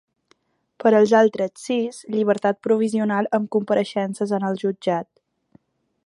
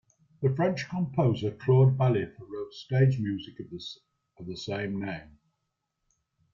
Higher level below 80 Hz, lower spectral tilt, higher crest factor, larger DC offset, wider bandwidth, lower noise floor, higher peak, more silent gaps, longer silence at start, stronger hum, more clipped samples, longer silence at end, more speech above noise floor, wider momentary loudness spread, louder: second, -72 dBFS vs -62 dBFS; second, -6 dB/octave vs -8 dB/octave; about the same, 18 dB vs 18 dB; neither; first, 11.5 kHz vs 7.2 kHz; second, -64 dBFS vs -81 dBFS; first, -4 dBFS vs -12 dBFS; neither; first, 0.8 s vs 0.4 s; neither; neither; second, 1.05 s vs 1.3 s; second, 43 dB vs 54 dB; second, 9 LU vs 19 LU; first, -21 LUFS vs -28 LUFS